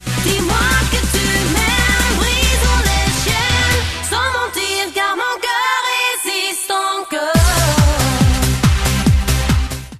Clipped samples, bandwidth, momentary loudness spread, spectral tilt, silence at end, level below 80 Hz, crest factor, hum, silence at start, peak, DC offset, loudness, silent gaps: under 0.1%; 14 kHz; 4 LU; -3.5 dB/octave; 0 s; -20 dBFS; 12 dB; none; 0 s; -2 dBFS; under 0.1%; -15 LUFS; none